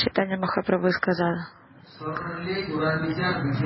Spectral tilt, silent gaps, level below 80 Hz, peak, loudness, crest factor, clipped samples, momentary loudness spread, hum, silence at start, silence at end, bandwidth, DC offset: -10.5 dB/octave; none; -54 dBFS; -8 dBFS; -26 LUFS; 18 dB; under 0.1%; 10 LU; none; 0 s; 0 s; 5.8 kHz; under 0.1%